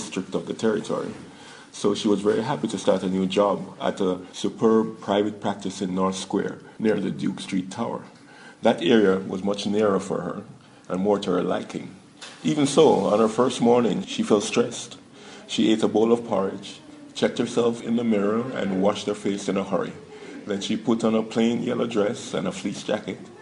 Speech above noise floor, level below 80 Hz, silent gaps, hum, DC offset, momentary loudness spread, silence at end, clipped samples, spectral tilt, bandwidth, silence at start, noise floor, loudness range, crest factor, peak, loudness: 24 dB; -68 dBFS; none; none; under 0.1%; 15 LU; 0 s; under 0.1%; -5.5 dB/octave; 11 kHz; 0 s; -47 dBFS; 4 LU; 20 dB; -4 dBFS; -24 LUFS